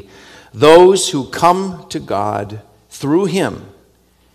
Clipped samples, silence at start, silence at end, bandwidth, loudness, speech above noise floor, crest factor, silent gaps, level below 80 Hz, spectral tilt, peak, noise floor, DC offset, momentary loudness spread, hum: 0.8%; 0.55 s; 0.7 s; 14.5 kHz; -13 LUFS; 40 dB; 14 dB; none; -50 dBFS; -4.5 dB/octave; 0 dBFS; -53 dBFS; under 0.1%; 19 LU; none